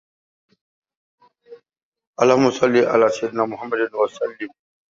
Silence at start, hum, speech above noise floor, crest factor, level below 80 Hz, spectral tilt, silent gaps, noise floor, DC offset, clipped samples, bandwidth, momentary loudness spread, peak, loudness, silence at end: 1.5 s; none; 28 dB; 20 dB; -66 dBFS; -5.5 dB/octave; 1.83-1.92 s, 2.07-2.13 s; -47 dBFS; under 0.1%; under 0.1%; 7.8 kHz; 15 LU; -2 dBFS; -19 LUFS; 0.45 s